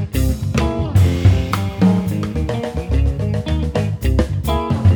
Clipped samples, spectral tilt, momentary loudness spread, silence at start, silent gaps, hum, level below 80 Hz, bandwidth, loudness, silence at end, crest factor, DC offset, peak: under 0.1%; -7.5 dB/octave; 6 LU; 0 s; none; none; -24 dBFS; 19.5 kHz; -18 LUFS; 0 s; 14 dB; under 0.1%; -2 dBFS